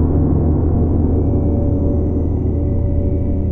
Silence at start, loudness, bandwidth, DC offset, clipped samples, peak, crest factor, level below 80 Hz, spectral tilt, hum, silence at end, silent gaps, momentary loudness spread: 0 s; -17 LUFS; 2.1 kHz; under 0.1%; under 0.1%; -4 dBFS; 10 dB; -20 dBFS; -14 dB/octave; none; 0 s; none; 3 LU